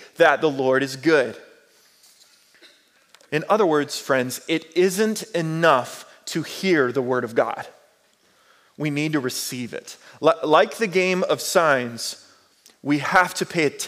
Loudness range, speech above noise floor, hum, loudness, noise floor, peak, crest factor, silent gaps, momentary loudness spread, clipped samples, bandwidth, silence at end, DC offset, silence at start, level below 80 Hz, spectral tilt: 4 LU; 39 dB; none; -21 LUFS; -60 dBFS; -4 dBFS; 18 dB; none; 12 LU; under 0.1%; 16 kHz; 0 s; under 0.1%; 0 s; -72 dBFS; -4 dB/octave